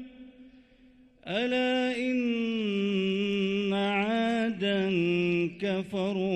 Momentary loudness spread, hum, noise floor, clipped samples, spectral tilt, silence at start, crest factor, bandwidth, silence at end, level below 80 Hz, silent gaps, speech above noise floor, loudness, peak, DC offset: 4 LU; none; -58 dBFS; under 0.1%; -6.5 dB/octave; 0 s; 12 dB; 9 kHz; 0 s; -66 dBFS; none; 30 dB; -28 LUFS; -16 dBFS; under 0.1%